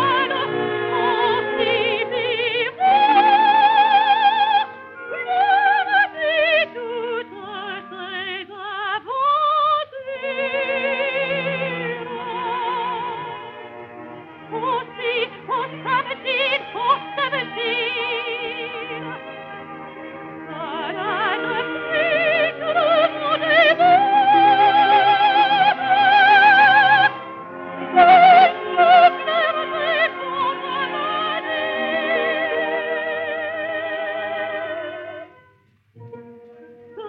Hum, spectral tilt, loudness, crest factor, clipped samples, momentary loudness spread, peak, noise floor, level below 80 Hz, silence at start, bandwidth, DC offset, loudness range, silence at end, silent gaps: none; -6 dB/octave; -18 LUFS; 18 dB; under 0.1%; 18 LU; 0 dBFS; -57 dBFS; -68 dBFS; 0 s; 5.8 kHz; under 0.1%; 13 LU; 0 s; none